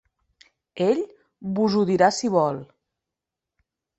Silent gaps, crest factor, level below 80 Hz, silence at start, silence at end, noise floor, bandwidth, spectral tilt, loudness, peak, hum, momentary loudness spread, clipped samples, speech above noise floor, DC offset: none; 20 dB; -66 dBFS; 0.75 s; 1.35 s; -86 dBFS; 8.2 kHz; -5.5 dB/octave; -22 LUFS; -6 dBFS; none; 17 LU; under 0.1%; 65 dB; under 0.1%